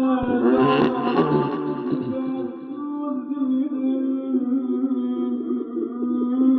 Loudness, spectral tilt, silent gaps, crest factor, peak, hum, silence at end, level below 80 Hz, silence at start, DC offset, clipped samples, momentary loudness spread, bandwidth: -23 LUFS; -9.5 dB/octave; none; 14 dB; -8 dBFS; none; 0 s; -56 dBFS; 0 s; under 0.1%; under 0.1%; 9 LU; 4.6 kHz